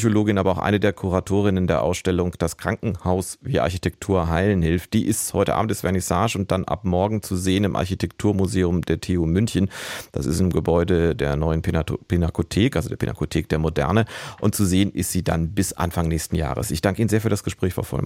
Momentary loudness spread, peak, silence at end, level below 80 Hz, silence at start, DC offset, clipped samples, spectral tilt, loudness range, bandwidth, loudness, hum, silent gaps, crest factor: 5 LU; -6 dBFS; 0 s; -38 dBFS; 0 s; under 0.1%; under 0.1%; -6 dB/octave; 1 LU; 16.5 kHz; -22 LUFS; none; none; 16 dB